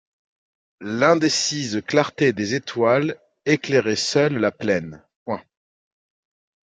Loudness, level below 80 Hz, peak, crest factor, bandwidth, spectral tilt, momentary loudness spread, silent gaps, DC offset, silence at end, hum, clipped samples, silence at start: -21 LUFS; -66 dBFS; -2 dBFS; 20 dB; 9.4 kHz; -4.5 dB/octave; 13 LU; 5.16-5.26 s; under 0.1%; 1.3 s; none; under 0.1%; 0.8 s